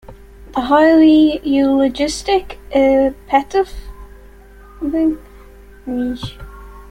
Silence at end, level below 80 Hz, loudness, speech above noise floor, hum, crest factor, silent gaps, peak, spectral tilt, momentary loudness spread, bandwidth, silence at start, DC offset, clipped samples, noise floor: 0.05 s; -38 dBFS; -15 LUFS; 26 dB; none; 14 dB; none; -2 dBFS; -5 dB/octave; 17 LU; 11.5 kHz; 0.1 s; under 0.1%; under 0.1%; -40 dBFS